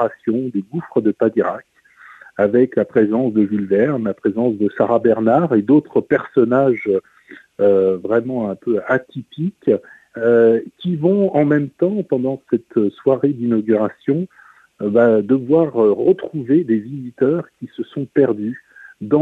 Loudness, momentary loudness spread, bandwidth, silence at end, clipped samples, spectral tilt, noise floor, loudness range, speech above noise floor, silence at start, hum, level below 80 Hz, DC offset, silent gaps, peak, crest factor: -17 LUFS; 10 LU; 4.4 kHz; 0 s; under 0.1%; -10 dB/octave; -44 dBFS; 3 LU; 28 dB; 0 s; none; -62 dBFS; under 0.1%; none; -2 dBFS; 16 dB